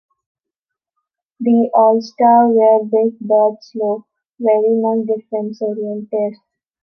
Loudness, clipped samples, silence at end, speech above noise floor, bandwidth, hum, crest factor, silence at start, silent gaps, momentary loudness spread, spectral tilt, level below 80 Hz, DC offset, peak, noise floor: -15 LUFS; under 0.1%; 0.5 s; 68 dB; 6.2 kHz; none; 14 dB; 1.4 s; 4.30-4.34 s; 11 LU; -8 dB/octave; -74 dBFS; under 0.1%; -2 dBFS; -83 dBFS